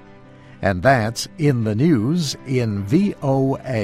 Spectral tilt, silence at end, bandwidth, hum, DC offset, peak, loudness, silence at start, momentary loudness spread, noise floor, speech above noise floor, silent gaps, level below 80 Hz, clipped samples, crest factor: -6.5 dB/octave; 0 s; 14.5 kHz; none; under 0.1%; -4 dBFS; -19 LUFS; 0.1 s; 6 LU; -43 dBFS; 25 dB; none; -48 dBFS; under 0.1%; 16 dB